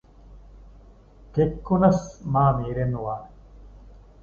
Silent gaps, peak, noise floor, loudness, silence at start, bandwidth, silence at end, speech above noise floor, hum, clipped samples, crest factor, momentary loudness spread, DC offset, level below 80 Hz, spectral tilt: none; -6 dBFS; -49 dBFS; -24 LUFS; 0.3 s; 7.4 kHz; 0.25 s; 27 dB; none; under 0.1%; 20 dB; 11 LU; under 0.1%; -42 dBFS; -9 dB/octave